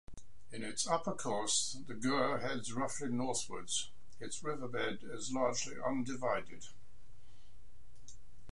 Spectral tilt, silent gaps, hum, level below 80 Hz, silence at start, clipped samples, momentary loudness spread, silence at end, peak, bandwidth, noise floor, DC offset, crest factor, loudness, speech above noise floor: -3 dB/octave; none; none; -64 dBFS; 0.05 s; under 0.1%; 12 LU; 0 s; -18 dBFS; 11.5 kHz; -62 dBFS; 1%; 22 dB; -37 LUFS; 24 dB